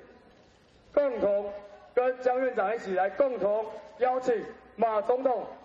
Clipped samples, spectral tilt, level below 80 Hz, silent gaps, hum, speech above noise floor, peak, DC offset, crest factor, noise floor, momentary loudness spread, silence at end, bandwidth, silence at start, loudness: under 0.1%; -6 dB/octave; -66 dBFS; none; none; 31 dB; -14 dBFS; under 0.1%; 16 dB; -59 dBFS; 6 LU; 0 s; 7.6 kHz; 0 s; -28 LUFS